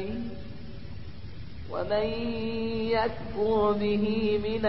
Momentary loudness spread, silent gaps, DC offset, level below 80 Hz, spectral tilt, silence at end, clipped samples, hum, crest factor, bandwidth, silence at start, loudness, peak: 18 LU; none; 1%; -46 dBFS; -10.5 dB/octave; 0 s; under 0.1%; none; 16 dB; 5.8 kHz; 0 s; -29 LUFS; -14 dBFS